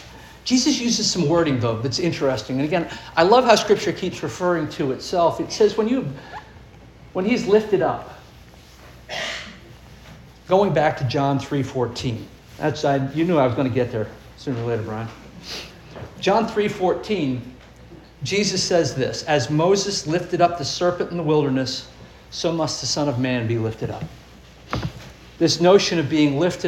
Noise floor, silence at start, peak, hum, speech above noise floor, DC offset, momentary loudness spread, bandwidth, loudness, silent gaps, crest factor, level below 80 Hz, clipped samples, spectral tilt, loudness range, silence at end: -45 dBFS; 0 s; -2 dBFS; none; 25 dB; under 0.1%; 15 LU; 16 kHz; -21 LUFS; none; 20 dB; -48 dBFS; under 0.1%; -5 dB/octave; 6 LU; 0 s